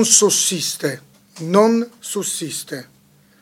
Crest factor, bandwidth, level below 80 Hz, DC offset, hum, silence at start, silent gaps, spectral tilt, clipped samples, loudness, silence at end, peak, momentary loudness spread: 20 dB; 17 kHz; -72 dBFS; under 0.1%; none; 0 s; none; -2.5 dB/octave; under 0.1%; -18 LUFS; 0.55 s; 0 dBFS; 19 LU